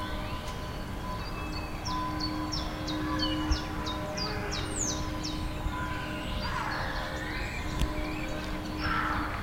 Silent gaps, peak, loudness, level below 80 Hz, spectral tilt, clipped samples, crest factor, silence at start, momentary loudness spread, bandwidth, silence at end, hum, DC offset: none; -12 dBFS; -33 LUFS; -38 dBFS; -4 dB/octave; under 0.1%; 20 dB; 0 s; 6 LU; 16 kHz; 0 s; none; under 0.1%